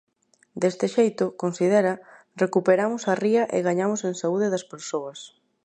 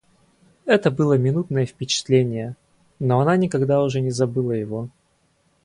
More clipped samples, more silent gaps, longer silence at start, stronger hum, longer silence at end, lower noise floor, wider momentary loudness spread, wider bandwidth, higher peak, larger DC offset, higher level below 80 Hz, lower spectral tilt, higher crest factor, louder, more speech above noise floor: neither; neither; about the same, 0.55 s vs 0.65 s; neither; second, 0.35 s vs 0.75 s; second, -53 dBFS vs -64 dBFS; about the same, 11 LU vs 12 LU; second, 9.6 kHz vs 11 kHz; second, -8 dBFS vs -4 dBFS; neither; second, -76 dBFS vs -58 dBFS; about the same, -5.5 dB/octave vs -6 dB/octave; about the same, 16 dB vs 18 dB; second, -24 LUFS vs -21 LUFS; second, 30 dB vs 44 dB